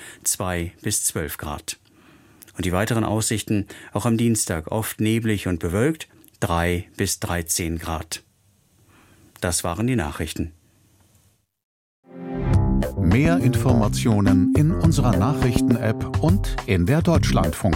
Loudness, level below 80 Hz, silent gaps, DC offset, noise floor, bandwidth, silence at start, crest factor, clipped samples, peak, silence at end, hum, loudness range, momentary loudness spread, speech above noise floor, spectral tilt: -22 LUFS; -34 dBFS; 11.63-12.03 s; under 0.1%; -61 dBFS; 17 kHz; 0 s; 18 dB; under 0.1%; -4 dBFS; 0 s; none; 9 LU; 11 LU; 40 dB; -5.5 dB/octave